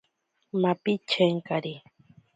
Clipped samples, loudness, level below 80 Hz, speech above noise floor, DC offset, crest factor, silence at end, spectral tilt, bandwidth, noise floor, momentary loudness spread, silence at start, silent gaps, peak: under 0.1%; -27 LUFS; -74 dBFS; 49 dB; under 0.1%; 20 dB; 0.55 s; -6.5 dB/octave; 9.2 kHz; -75 dBFS; 12 LU; 0.55 s; none; -8 dBFS